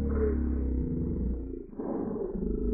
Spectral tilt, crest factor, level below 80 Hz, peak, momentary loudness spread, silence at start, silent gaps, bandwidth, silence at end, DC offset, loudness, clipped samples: -10 dB/octave; 14 dB; -34 dBFS; -16 dBFS; 8 LU; 0 s; none; 2.3 kHz; 0 s; under 0.1%; -33 LUFS; under 0.1%